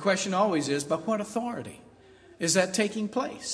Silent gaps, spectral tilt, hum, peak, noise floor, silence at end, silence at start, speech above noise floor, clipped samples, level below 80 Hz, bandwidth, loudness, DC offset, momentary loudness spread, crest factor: none; -3.5 dB/octave; none; -8 dBFS; -54 dBFS; 0 s; 0 s; 26 dB; under 0.1%; -70 dBFS; 11 kHz; -28 LUFS; under 0.1%; 9 LU; 20 dB